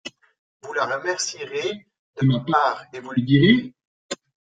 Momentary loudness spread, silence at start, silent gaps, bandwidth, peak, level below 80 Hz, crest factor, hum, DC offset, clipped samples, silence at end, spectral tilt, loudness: 19 LU; 0.05 s; 0.39-0.60 s, 1.99-2.14 s, 3.87-4.09 s; 9.4 kHz; -4 dBFS; -58 dBFS; 20 dB; none; under 0.1%; under 0.1%; 0.45 s; -5.5 dB/octave; -22 LUFS